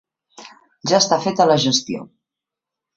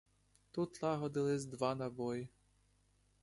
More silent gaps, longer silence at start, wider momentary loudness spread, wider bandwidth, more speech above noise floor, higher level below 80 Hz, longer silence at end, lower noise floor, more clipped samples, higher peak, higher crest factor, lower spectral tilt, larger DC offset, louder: neither; second, 0.4 s vs 0.55 s; first, 14 LU vs 8 LU; second, 8 kHz vs 11.5 kHz; first, 68 dB vs 35 dB; first, -62 dBFS vs -72 dBFS; about the same, 0.95 s vs 0.95 s; first, -86 dBFS vs -74 dBFS; neither; first, -2 dBFS vs -20 dBFS; about the same, 20 dB vs 20 dB; second, -3.5 dB/octave vs -6.5 dB/octave; neither; first, -17 LUFS vs -40 LUFS